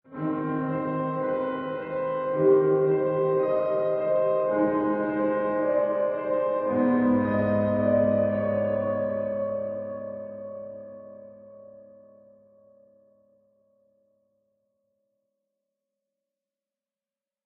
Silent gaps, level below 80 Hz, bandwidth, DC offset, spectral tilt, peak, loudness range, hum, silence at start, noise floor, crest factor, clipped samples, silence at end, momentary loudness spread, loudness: none; -64 dBFS; 4 kHz; under 0.1%; -8 dB/octave; -10 dBFS; 13 LU; none; 0.1 s; under -90 dBFS; 18 dB; under 0.1%; 5.6 s; 14 LU; -25 LUFS